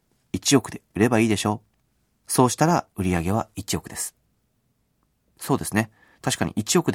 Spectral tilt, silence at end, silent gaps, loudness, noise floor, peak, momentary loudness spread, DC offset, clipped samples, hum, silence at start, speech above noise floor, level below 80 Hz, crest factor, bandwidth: -4.5 dB/octave; 0 s; none; -23 LUFS; -69 dBFS; -4 dBFS; 12 LU; under 0.1%; under 0.1%; none; 0.35 s; 47 dB; -52 dBFS; 20 dB; 17 kHz